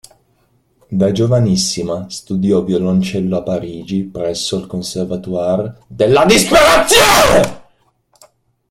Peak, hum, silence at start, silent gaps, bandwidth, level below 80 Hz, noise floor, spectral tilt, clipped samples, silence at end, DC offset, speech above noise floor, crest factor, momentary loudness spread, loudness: 0 dBFS; none; 0.9 s; none; 17 kHz; -38 dBFS; -58 dBFS; -4 dB/octave; under 0.1%; 1.1 s; under 0.1%; 45 dB; 14 dB; 14 LU; -13 LUFS